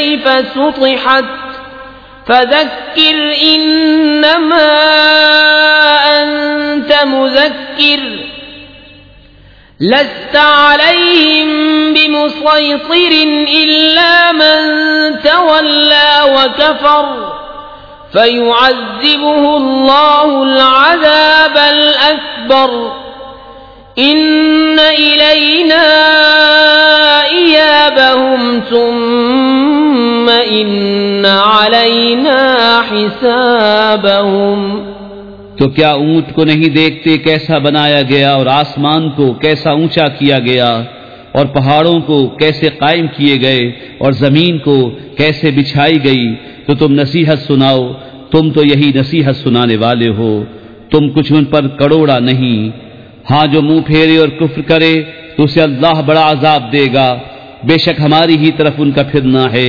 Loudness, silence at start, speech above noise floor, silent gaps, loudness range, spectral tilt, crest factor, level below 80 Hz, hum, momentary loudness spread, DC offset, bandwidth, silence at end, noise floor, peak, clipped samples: -8 LUFS; 0 s; 31 dB; none; 5 LU; -7 dB/octave; 8 dB; -44 dBFS; none; 9 LU; 0.3%; 5.4 kHz; 0 s; -39 dBFS; 0 dBFS; 1%